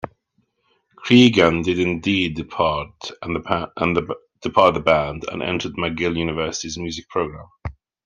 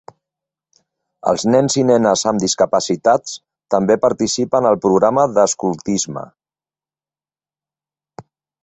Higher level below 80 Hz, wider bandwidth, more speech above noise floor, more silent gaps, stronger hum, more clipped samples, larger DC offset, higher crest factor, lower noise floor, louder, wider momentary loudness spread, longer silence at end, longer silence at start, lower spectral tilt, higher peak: first, -46 dBFS vs -56 dBFS; second, 7.6 kHz vs 8.4 kHz; second, 48 dB vs over 75 dB; neither; neither; neither; neither; about the same, 20 dB vs 18 dB; second, -68 dBFS vs under -90 dBFS; second, -20 LUFS vs -16 LUFS; first, 17 LU vs 7 LU; about the same, 0.35 s vs 0.4 s; second, 0.05 s vs 1.25 s; about the same, -5 dB/octave vs -4.5 dB/octave; about the same, 0 dBFS vs 0 dBFS